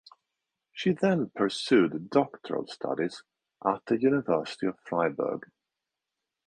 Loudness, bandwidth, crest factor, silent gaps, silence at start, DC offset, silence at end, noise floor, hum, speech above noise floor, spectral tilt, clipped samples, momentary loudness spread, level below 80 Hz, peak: -28 LUFS; 10 kHz; 20 dB; none; 0.75 s; under 0.1%; 1.1 s; -87 dBFS; none; 60 dB; -6 dB/octave; under 0.1%; 10 LU; -70 dBFS; -8 dBFS